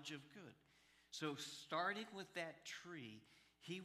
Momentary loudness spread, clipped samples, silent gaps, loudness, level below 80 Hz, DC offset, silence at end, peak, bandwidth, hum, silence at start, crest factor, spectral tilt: 18 LU; under 0.1%; none; -49 LUFS; -90 dBFS; under 0.1%; 0 s; -30 dBFS; 15 kHz; none; 0 s; 22 dB; -3.5 dB/octave